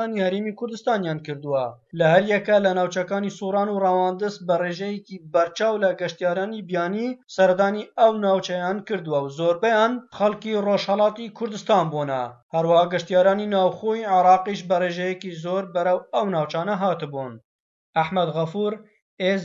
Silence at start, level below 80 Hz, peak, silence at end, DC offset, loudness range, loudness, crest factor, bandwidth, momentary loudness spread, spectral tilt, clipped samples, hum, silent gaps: 0 s; -70 dBFS; -4 dBFS; 0 s; under 0.1%; 4 LU; -22 LUFS; 18 dB; 7.6 kHz; 9 LU; -6 dB/octave; under 0.1%; none; 12.42-12.50 s, 17.44-17.93 s, 19.02-19.17 s